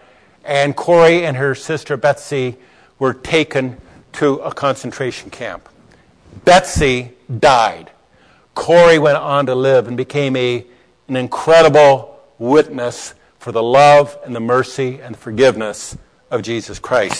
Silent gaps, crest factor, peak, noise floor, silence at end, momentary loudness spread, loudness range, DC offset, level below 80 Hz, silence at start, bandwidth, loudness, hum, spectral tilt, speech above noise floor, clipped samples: none; 14 dB; -2 dBFS; -51 dBFS; 0 s; 18 LU; 6 LU; under 0.1%; -42 dBFS; 0.45 s; 11 kHz; -14 LUFS; none; -5 dB/octave; 37 dB; under 0.1%